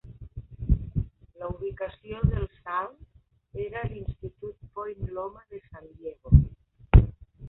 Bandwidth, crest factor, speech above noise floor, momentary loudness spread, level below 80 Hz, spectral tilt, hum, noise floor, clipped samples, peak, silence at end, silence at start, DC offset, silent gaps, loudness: 4 kHz; 24 dB; 14 dB; 22 LU; -30 dBFS; -12 dB/octave; none; -43 dBFS; under 0.1%; -2 dBFS; 0 s; 0.05 s; under 0.1%; none; -28 LUFS